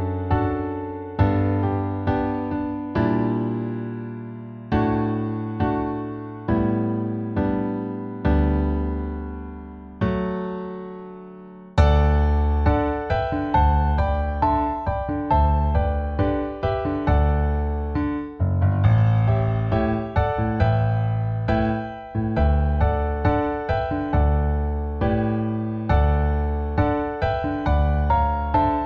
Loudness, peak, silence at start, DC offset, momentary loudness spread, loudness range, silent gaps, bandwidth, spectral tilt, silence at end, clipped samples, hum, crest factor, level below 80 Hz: -23 LUFS; -4 dBFS; 0 s; under 0.1%; 10 LU; 4 LU; none; 5 kHz; -10 dB/octave; 0 s; under 0.1%; none; 18 dB; -26 dBFS